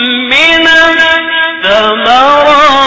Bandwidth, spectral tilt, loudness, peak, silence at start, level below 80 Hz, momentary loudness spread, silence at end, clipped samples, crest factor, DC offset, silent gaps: 8 kHz; -2.5 dB/octave; -5 LUFS; 0 dBFS; 0 s; -38 dBFS; 5 LU; 0 s; 2%; 6 dB; under 0.1%; none